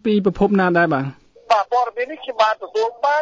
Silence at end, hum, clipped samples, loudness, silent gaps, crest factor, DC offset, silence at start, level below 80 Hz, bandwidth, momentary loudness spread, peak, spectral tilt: 0 s; none; under 0.1%; -19 LUFS; none; 18 dB; under 0.1%; 0.05 s; -48 dBFS; 7.8 kHz; 8 LU; -2 dBFS; -6.5 dB/octave